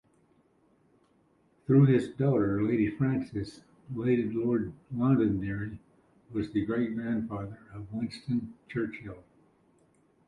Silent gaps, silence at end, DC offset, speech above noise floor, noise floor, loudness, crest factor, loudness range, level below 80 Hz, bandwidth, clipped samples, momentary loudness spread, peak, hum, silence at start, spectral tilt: none; 1.05 s; under 0.1%; 38 dB; -67 dBFS; -30 LUFS; 18 dB; 7 LU; -58 dBFS; 10.5 kHz; under 0.1%; 17 LU; -12 dBFS; none; 1.7 s; -9.5 dB/octave